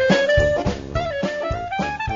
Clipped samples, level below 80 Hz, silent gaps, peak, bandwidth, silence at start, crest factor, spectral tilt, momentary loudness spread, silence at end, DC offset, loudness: under 0.1%; -34 dBFS; none; -4 dBFS; 7.6 kHz; 0 s; 16 dB; -5.5 dB/octave; 9 LU; 0 s; under 0.1%; -21 LUFS